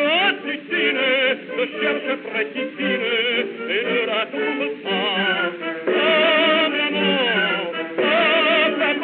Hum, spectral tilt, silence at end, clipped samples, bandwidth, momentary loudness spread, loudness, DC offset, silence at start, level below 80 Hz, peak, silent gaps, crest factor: none; -0.5 dB/octave; 0 s; under 0.1%; 4.6 kHz; 9 LU; -19 LUFS; under 0.1%; 0 s; -90 dBFS; -6 dBFS; none; 14 dB